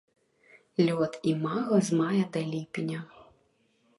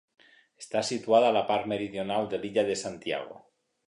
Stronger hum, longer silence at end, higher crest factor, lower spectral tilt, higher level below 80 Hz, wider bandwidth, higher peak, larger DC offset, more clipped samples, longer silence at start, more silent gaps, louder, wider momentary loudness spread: neither; first, 0.75 s vs 0.5 s; about the same, 18 dB vs 18 dB; first, -6.5 dB/octave vs -4 dB/octave; about the same, -72 dBFS vs -68 dBFS; about the same, 11.5 kHz vs 11 kHz; about the same, -12 dBFS vs -10 dBFS; neither; neither; first, 0.8 s vs 0.6 s; neither; about the same, -29 LUFS vs -28 LUFS; about the same, 10 LU vs 11 LU